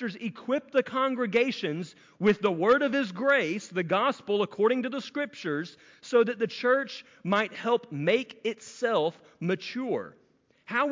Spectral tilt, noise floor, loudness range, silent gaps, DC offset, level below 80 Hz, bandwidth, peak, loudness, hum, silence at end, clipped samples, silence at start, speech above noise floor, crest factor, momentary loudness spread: -5.5 dB/octave; -52 dBFS; 3 LU; none; under 0.1%; -74 dBFS; 7.6 kHz; -12 dBFS; -28 LUFS; none; 0 s; under 0.1%; 0 s; 24 dB; 16 dB; 10 LU